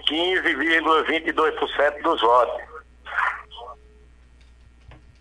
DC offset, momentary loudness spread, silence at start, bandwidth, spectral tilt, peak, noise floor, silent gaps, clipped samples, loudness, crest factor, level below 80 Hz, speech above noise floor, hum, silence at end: under 0.1%; 22 LU; 0 s; 11 kHz; -3.5 dB/octave; -4 dBFS; -50 dBFS; none; under 0.1%; -21 LUFS; 18 dB; -52 dBFS; 30 dB; 60 Hz at -50 dBFS; 0.25 s